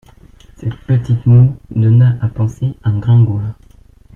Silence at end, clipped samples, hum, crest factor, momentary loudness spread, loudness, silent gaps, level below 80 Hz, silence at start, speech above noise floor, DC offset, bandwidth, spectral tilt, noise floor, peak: 0.6 s; under 0.1%; none; 12 dB; 14 LU; -13 LUFS; none; -40 dBFS; 0.6 s; 31 dB; under 0.1%; 3.4 kHz; -10 dB/octave; -43 dBFS; -2 dBFS